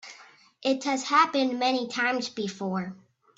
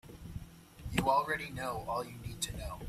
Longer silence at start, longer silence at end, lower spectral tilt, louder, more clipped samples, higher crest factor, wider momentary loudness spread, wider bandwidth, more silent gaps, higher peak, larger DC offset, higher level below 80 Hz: about the same, 0.05 s vs 0.05 s; first, 0.4 s vs 0 s; about the same, -4 dB/octave vs -4 dB/octave; first, -26 LUFS vs -35 LUFS; neither; about the same, 22 dB vs 22 dB; second, 11 LU vs 18 LU; second, 8 kHz vs 16 kHz; neither; first, -6 dBFS vs -16 dBFS; neither; second, -76 dBFS vs -52 dBFS